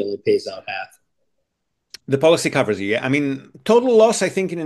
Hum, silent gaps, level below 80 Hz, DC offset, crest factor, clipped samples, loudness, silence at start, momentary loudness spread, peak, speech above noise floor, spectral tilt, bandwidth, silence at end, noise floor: none; none; -64 dBFS; under 0.1%; 18 dB; under 0.1%; -18 LUFS; 0 s; 14 LU; -2 dBFS; 57 dB; -4.5 dB/octave; 12.5 kHz; 0 s; -75 dBFS